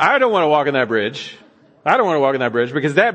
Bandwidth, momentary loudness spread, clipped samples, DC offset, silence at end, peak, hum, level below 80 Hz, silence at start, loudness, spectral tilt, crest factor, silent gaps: 8.8 kHz; 10 LU; under 0.1%; under 0.1%; 0 s; 0 dBFS; none; -70 dBFS; 0 s; -17 LUFS; -5.5 dB/octave; 16 dB; none